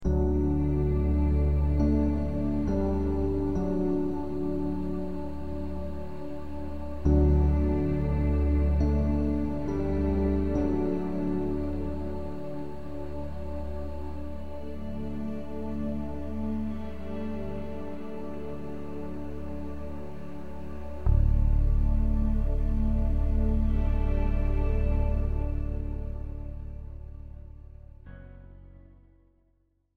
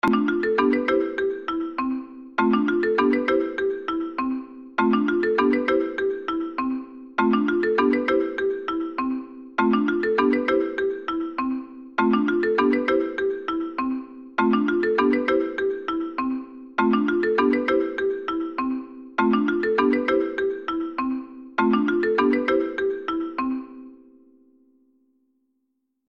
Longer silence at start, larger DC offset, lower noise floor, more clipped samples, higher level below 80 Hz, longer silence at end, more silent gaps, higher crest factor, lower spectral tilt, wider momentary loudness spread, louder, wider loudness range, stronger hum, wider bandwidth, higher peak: about the same, 0 s vs 0.05 s; first, 2% vs under 0.1%; second, -70 dBFS vs -75 dBFS; neither; first, -30 dBFS vs -58 dBFS; second, 0 s vs 2.15 s; neither; about the same, 18 dB vs 16 dB; first, -10 dB/octave vs -7 dB/octave; first, 14 LU vs 8 LU; second, -30 LUFS vs -23 LUFS; first, 11 LU vs 1 LU; neither; second, 4.7 kHz vs 6.8 kHz; second, -10 dBFS vs -6 dBFS